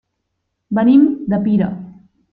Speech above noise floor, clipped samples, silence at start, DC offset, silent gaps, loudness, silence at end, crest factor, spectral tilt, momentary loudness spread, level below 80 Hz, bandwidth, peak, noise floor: 60 dB; under 0.1%; 0.7 s; under 0.1%; none; -15 LUFS; 0.4 s; 14 dB; -12 dB/octave; 11 LU; -54 dBFS; 4.3 kHz; -2 dBFS; -73 dBFS